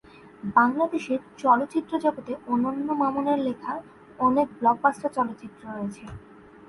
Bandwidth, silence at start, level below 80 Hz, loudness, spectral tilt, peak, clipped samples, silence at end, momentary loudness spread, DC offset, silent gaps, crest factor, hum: 11.5 kHz; 0.25 s; -60 dBFS; -25 LUFS; -6.5 dB/octave; -6 dBFS; under 0.1%; 0.5 s; 15 LU; under 0.1%; none; 20 dB; none